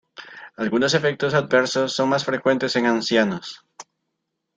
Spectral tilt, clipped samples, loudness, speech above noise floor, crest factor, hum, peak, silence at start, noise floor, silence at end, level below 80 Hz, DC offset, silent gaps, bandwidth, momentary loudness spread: -4.5 dB/octave; under 0.1%; -20 LUFS; 58 dB; 20 dB; none; -4 dBFS; 0.2 s; -78 dBFS; 0.75 s; -64 dBFS; under 0.1%; none; 9.4 kHz; 19 LU